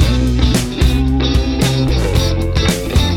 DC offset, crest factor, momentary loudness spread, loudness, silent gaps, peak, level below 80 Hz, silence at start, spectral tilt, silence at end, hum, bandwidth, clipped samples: under 0.1%; 12 dB; 1 LU; -15 LUFS; none; 0 dBFS; -18 dBFS; 0 s; -5.5 dB/octave; 0 s; none; 17 kHz; under 0.1%